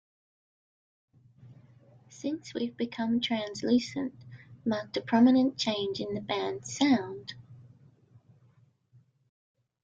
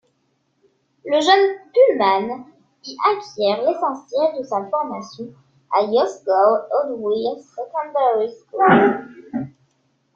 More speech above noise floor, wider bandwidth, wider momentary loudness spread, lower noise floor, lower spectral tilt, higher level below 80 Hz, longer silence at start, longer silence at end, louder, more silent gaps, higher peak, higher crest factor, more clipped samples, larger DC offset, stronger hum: second, 36 dB vs 49 dB; about the same, 7.8 kHz vs 7.6 kHz; about the same, 16 LU vs 17 LU; about the same, -64 dBFS vs -67 dBFS; about the same, -4.5 dB/octave vs -5 dB/octave; about the same, -70 dBFS vs -66 dBFS; first, 1.45 s vs 1.05 s; first, 2.2 s vs 0.65 s; second, -29 LUFS vs -19 LUFS; neither; second, -12 dBFS vs -2 dBFS; about the same, 20 dB vs 18 dB; neither; neither; neither